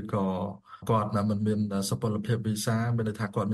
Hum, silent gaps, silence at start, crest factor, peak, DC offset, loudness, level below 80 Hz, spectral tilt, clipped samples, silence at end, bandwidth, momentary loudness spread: none; none; 0 s; 14 dB; -14 dBFS; under 0.1%; -29 LUFS; -60 dBFS; -6.5 dB/octave; under 0.1%; 0 s; 12.5 kHz; 4 LU